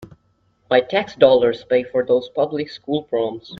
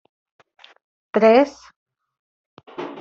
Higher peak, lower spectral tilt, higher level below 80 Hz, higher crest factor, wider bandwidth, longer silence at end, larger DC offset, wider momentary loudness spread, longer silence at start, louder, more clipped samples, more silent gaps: about the same, 0 dBFS vs -2 dBFS; about the same, -6.5 dB/octave vs -6 dB/octave; first, -60 dBFS vs -68 dBFS; about the same, 18 dB vs 20 dB; second, 6.4 kHz vs 7.6 kHz; about the same, 0.05 s vs 0 s; neither; second, 11 LU vs 21 LU; second, 0 s vs 1.15 s; about the same, -19 LUFS vs -17 LUFS; neither; second, none vs 1.76-1.86 s, 2.19-2.57 s